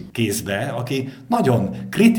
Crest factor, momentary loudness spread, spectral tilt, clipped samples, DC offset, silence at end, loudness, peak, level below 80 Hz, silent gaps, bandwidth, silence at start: 16 dB; 7 LU; -5.5 dB/octave; under 0.1%; under 0.1%; 0 s; -21 LUFS; -2 dBFS; -54 dBFS; none; over 20 kHz; 0 s